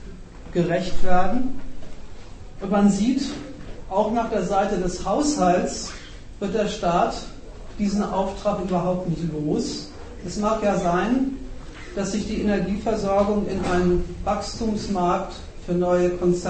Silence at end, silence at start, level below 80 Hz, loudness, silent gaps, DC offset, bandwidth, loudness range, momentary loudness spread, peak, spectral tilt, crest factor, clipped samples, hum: 0 s; 0 s; -36 dBFS; -23 LUFS; none; under 0.1%; 8.8 kHz; 2 LU; 19 LU; -4 dBFS; -6 dB/octave; 18 dB; under 0.1%; none